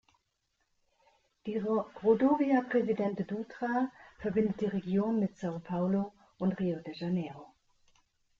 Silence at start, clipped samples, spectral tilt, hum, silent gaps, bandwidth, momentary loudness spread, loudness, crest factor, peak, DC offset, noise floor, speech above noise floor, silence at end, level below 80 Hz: 1.45 s; under 0.1%; -9 dB/octave; none; none; 7.2 kHz; 11 LU; -32 LUFS; 18 dB; -14 dBFS; under 0.1%; -79 dBFS; 48 dB; 0.95 s; -68 dBFS